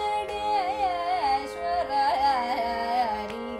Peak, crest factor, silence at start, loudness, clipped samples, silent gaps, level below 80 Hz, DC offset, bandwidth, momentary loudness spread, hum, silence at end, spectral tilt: -14 dBFS; 12 dB; 0 s; -26 LUFS; under 0.1%; none; -52 dBFS; under 0.1%; 14 kHz; 5 LU; none; 0 s; -4 dB/octave